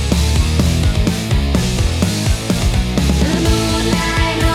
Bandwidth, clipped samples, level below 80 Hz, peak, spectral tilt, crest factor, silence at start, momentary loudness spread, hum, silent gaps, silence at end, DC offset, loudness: 16 kHz; under 0.1%; -20 dBFS; 0 dBFS; -5 dB/octave; 14 dB; 0 s; 2 LU; none; none; 0 s; under 0.1%; -16 LUFS